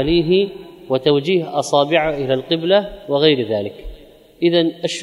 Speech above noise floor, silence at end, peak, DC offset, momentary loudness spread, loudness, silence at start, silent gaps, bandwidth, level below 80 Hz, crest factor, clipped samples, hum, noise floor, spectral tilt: 25 dB; 0 s; 0 dBFS; under 0.1%; 8 LU; -17 LUFS; 0 s; none; 12 kHz; -42 dBFS; 18 dB; under 0.1%; none; -42 dBFS; -5.5 dB/octave